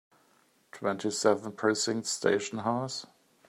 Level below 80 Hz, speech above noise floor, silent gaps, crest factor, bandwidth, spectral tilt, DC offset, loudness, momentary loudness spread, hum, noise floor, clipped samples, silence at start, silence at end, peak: -78 dBFS; 37 dB; none; 22 dB; 14 kHz; -3.5 dB/octave; under 0.1%; -30 LUFS; 7 LU; none; -67 dBFS; under 0.1%; 0.75 s; 0.45 s; -10 dBFS